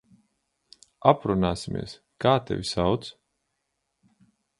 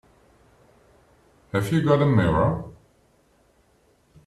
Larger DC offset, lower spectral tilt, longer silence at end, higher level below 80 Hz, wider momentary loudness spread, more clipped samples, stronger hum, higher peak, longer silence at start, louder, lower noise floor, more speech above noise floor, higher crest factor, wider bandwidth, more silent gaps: neither; second, -6 dB/octave vs -8 dB/octave; about the same, 1.5 s vs 1.55 s; about the same, -50 dBFS vs -48 dBFS; about the same, 12 LU vs 12 LU; neither; neither; first, -2 dBFS vs -6 dBFS; second, 1.05 s vs 1.55 s; second, -25 LUFS vs -22 LUFS; first, -79 dBFS vs -62 dBFS; first, 54 dB vs 42 dB; first, 26 dB vs 20 dB; second, 11.5 kHz vs 13.5 kHz; neither